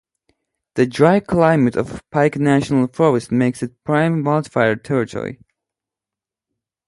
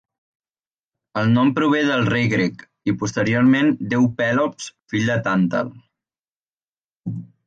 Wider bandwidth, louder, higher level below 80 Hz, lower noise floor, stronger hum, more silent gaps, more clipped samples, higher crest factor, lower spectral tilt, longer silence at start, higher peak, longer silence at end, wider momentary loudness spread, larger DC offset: first, 11.5 kHz vs 8.8 kHz; about the same, -17 LUFS vs -19 LUFS; first, -50 dBFS vs -56 dBFS; about the same, -88 dBFS vs under -90 dBFS; neither; second, none vs 6.29-6.36 s, 6.49-6.57 s, 6.68-6.74 s, 6.84-7.03 s; neither; about the same, 18 dB vs 14 dB; about the same, -7.5 dB/octave vs -6.5 dB/octave; second, 0.75 s vs 1.15 s; first, 0 dBFS vs -6 dBFS; first, 1.55 s vs 0.25 s; second, 10 LU vs 14 LU; neither